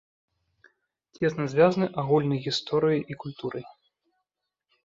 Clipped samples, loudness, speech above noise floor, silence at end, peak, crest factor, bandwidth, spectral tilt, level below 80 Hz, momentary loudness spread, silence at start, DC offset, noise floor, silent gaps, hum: under 0.1%; -26 LUFS; 59 dB; 1.15 s; -8 dBFS; 20 dB; 7.8 kHz; -6.5 dB/octave; -66 dBFS; 13 LU; 1.2 s; under 0.1%; -84 dBFS; none; none